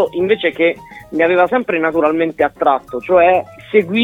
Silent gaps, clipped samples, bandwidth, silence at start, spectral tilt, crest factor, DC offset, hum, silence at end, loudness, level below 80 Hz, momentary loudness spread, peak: none; under 0.1%; 7.6 kHz; 0 s; -7 dB/octave; 14 dB; under 0.1%; none; 0 s; -15 LUFS; -50 dBFS; 5 LU; 0 dBFS